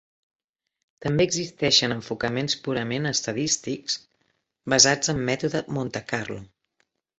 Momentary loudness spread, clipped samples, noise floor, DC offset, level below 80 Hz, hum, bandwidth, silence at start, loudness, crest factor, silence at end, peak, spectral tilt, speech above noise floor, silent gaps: 12 LU; under 0.1%; -73 dBFS; under 0.1%; -56 dBFS; none; 8.4 kHz; 1 s; -24 LUFS; 24 dB; 0.75 s; -2 dBFS; -3 dB/octave; 48 dB; none